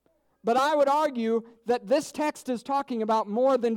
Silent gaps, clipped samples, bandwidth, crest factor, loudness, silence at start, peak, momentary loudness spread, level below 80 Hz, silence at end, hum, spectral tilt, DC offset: none; under 0.1%; 16.5 kHz; 12 dB; -26 LUFS; 0.45 s; -12 dBFS; 8 LU; -74 dBFS; 0 s; none; -4.5 dB/octave; under 0.1%